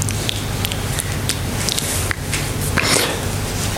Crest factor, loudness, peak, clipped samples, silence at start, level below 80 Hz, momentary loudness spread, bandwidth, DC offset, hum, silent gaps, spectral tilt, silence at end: 20 dB; -19 LUFS; 0 dBFS; under 0.1%; 0 s; -32 dBFS; 6 LU; 17 kHz; under 0.1%; none; none; -3 dB/octave; 0 s